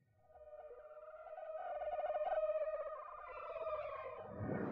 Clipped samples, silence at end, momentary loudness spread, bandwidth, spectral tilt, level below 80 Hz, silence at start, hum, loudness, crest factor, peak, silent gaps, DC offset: under 0.1%; 0 s; 17 LU; 4.9 kHz; -6.5 dB/octave; -72 dBFS; 0.3 s; none; -44 LUFS; 14 dB; -30 dBFS; none; under 0.1%